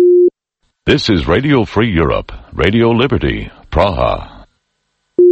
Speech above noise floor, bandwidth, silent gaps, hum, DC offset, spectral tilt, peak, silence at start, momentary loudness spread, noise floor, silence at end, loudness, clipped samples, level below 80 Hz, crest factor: 54 dB; 8 kHz; none; none; under 0.1%; -7 dB/octave; 0 dBFS; 0 s; 10 LU; -67 dBFS; 0 s; -14 LUFS; under 0.1%; -28 dBFS; 14 dB